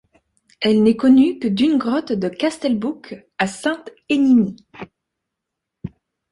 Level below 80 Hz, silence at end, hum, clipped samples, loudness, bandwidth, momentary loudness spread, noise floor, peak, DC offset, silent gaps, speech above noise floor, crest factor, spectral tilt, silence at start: -56 dBFS; 0.45 s; none; under 0.1%; -18 LUFS; 11.5 kHz; 22 LU; -81 dBFS; -2 dBFS; under 0.1%; none; 64 dB; 16 dB; -6 dB/octave; 0.6 s